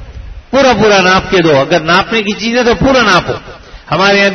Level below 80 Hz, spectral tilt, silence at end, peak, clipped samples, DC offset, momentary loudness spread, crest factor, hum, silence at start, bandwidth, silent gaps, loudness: -32 dBFS; -4.5 dB/octave; 0 s; 0 dBFS; under 0.1%; under 0.1%; 7 LU; 10 dB; none; 0 s; 7.4 kHz; none; -9 LUFS